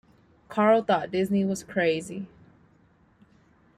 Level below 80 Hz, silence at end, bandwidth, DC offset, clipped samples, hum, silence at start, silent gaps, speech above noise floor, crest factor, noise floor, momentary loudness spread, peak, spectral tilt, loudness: -66 dBFS; 1.5 s; 14 kHz; under 0.1%; under 0.1%; none; 0.5 s; none; 36 dB; 18 dB; -61 dBFS; 16 LU; -10 dBFS; -6 dB/octave; -25 LUFS